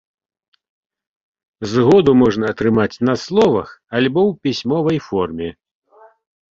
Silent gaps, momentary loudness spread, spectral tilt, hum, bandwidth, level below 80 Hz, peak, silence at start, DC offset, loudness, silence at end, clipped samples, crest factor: none; 12 LU; -7 dB/octave; none; 7.6 kHz; -50 dBFS; -2 dBFS; 1.6 s; under 0.1%; -16 LUFS; 1 s; under 0.1%; 16 dB